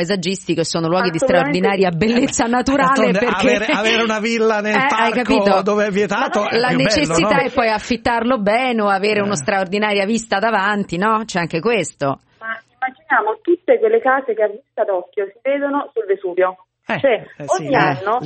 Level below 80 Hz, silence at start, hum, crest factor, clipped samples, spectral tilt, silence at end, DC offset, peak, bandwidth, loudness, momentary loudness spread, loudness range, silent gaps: -48 dBFS; 0 s; none; 16 dB; under 0.1%; -4.5 dB/octave; 0 s; under 0.1%; 0 dBFS; 8.8 kHz; -17 LUFS; 7 LU; 4 LU; none